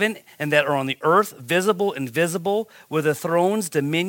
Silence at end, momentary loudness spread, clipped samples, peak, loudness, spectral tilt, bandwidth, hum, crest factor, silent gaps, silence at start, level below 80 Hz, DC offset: 0 s; 6 LU; under 0.1%; -2 dBFS; -22 LUFS; -4.5 dB/octave; 17 kHz; none; 20 dB; none; 0 s; -72 dBFS; under 0.1%